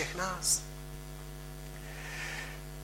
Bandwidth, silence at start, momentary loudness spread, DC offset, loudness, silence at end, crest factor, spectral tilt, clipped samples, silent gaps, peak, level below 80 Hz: 16 kHz; 0 s; 16 LU; under 0.1%; -36 LUFS; 0 s; 22 dB; -2 dB/octave; under 0.1%; none; -16 dBFS; -48 dBFS